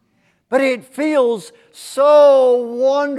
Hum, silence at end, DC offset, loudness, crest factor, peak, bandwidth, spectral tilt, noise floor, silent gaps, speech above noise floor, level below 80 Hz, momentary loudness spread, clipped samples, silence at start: none; 0 s; under 0.1%; -14 LUFS; 14 dB; -2 dBFS; 13 kHz; -4 dB/octave; -61 dBFS; none; 47 dB; -76 dBFS; 11 LU; under 0.1%; 0.5 s